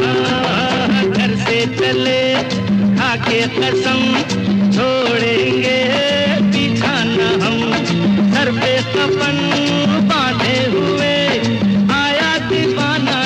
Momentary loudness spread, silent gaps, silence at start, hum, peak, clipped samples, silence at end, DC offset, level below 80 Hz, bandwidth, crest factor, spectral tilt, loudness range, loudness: 2 LU; none; 0 s; none; -4 dBFS; under 0.1%; 0 s; under 0.1%; -44 dBFS; 9.6 kHz; 10 dB; -5 dB/octave; 1 LU; -15 LUFS